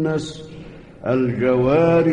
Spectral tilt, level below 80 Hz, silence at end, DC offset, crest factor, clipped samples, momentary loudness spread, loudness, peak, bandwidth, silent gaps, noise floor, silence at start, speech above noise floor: -7.5 dB/octave; -46 dBFS; 0 s; 0.1%; 12 dB; under 0.1%; 21 LU; -19 LUFS; -6 dBFS; 10 kHz; none; -38 dBFS; 0 s; 20 dB